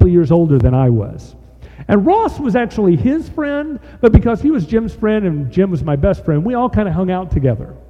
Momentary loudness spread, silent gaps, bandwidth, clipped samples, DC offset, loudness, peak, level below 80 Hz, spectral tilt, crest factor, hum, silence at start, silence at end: 8 LU; none; 7.6 kHz; under 0.1%; under 0.1%; -15 LUFS; 0 dBFS; -26 dBFS; -9.5 dB/octave; 14 dB; none; 0 s; 0.1 s